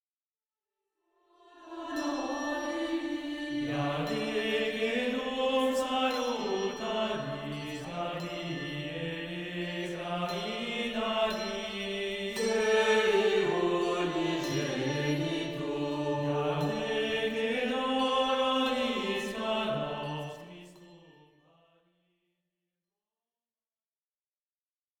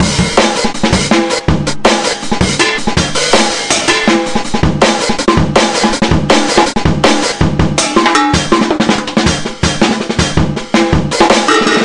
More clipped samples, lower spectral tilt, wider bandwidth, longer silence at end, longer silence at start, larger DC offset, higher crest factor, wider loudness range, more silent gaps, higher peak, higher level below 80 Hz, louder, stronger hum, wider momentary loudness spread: second, under 0.1% vs 0.2%; about the same, -5 dB/octave vs -4 dB/octave; first, 19.5 kHz vs 11.5 kHz; first, 3.9 s vs 0 s; first, 1.55 s vs 0 s; neither; first, 18 dB vs 10 dB; first, 7 LU vs 1 LU; neither; second, -14 dBFS vs 0 dBFS; second, -62 dBFS vs -28 dBFS; second, -31 LUFS vs -11 LUFS; neither; first, 9 LU vs 4 LU